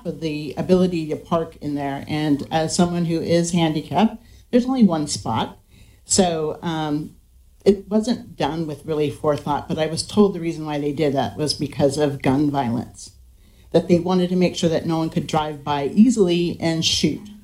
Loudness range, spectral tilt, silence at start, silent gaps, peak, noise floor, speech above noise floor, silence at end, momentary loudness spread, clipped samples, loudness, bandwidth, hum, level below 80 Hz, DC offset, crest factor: 3 LU; -5.5 dB/octave; 0.05 s; none; -2 dBFS; -49 dBFS; 29 dB; 0.05 s; 8 LU; under 0.1%; -21 LUFS; 15.5 kHz; none; -48 dBFS; under 0.1%; 18 dB